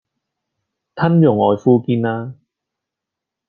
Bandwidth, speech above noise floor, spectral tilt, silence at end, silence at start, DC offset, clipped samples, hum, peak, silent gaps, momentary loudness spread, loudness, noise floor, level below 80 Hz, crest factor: 6.4 kHz; 69 dB; -10 dB/octave; 1.15 s; 0.95 s; under 0.1%; under 0.1%; none; -2 dBFS; none; 11 LU; -15 LUFS; -83 dBFS; -62 dBFS; 16 dB